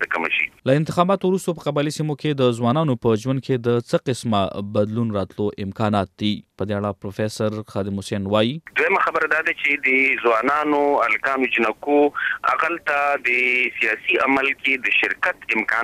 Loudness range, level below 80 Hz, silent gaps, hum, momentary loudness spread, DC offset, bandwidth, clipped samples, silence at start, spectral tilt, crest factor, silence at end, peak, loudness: 5 LU; -60 dBFS; none; none; 8 LU; under 0.1%; 15 kHz; under 0.1%; 0 s; -6 dB/octave; 18 dB; 0 s; -2 dBFS; -20 LUFS